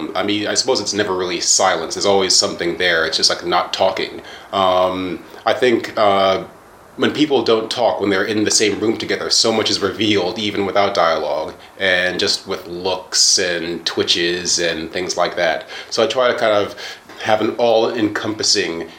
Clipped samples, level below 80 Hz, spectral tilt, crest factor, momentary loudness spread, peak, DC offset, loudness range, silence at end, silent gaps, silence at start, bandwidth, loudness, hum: under 0.1%; -56 dBFS; -2 dB/octave; 16 dB; 9 LU; 0 dBFS; under 0.1%; 2 LU; 0 s; none; 0 s; 16.5 kHz; -17 LUFS; none